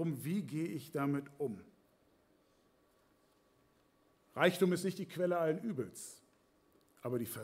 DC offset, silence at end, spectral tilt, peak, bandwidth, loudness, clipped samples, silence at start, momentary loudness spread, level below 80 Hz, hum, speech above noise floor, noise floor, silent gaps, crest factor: under 0.1%; 0 s; -6 dB/octave; -16 dBFS; 16 kHz; -37 LUFS; under 0.1%; 0 s; 15 LU; -80 dBFS; none; 35 dB; -72 dBFS; none; 24 dB